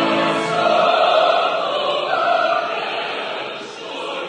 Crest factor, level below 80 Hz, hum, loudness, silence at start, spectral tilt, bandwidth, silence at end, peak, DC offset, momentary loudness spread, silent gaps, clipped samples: 16 dB; -72 dBFS; none; -18 LUFS; 0 s; -4 dB/octave; 10 kHz; 0 s; -2 dBFS; under 0.1%; 13 LU; none; under 0.1%